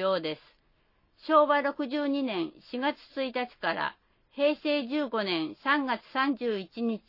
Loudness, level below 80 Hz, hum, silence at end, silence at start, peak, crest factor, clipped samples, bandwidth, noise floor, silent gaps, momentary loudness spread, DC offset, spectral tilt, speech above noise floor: -29 LUFS; -72 dBFS; none; 0.1 s; 0 s; -10 dBFS; 20 dB; under 0.1%; 5.8 kHz; -68 dBFS; none; 9 LU; under 0.1%; -7 dB/octave; 39 dB